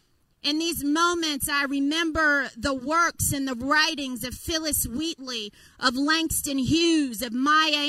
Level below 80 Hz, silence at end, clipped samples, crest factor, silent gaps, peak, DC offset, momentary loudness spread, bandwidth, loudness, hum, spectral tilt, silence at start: -48 dBFS; 0 s; under 0.1%; 18 dB; none; -8 dBFS; under 0.1%; 9 LU; 16 kHz; -24 LUFS; none; -2.5 dB/octave; 0.45 s